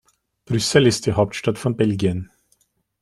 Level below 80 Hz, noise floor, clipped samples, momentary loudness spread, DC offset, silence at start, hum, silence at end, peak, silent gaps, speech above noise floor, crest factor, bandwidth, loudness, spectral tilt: -52 dBFS; -65 dBFS; under 0.1%; 10 LU; under 0.1%; 0.5 s; none; 0.8 s; -2 dBFS; none; 46 dB; 20 dB; 15 kHz; -20 LUFS; -5 dB/octave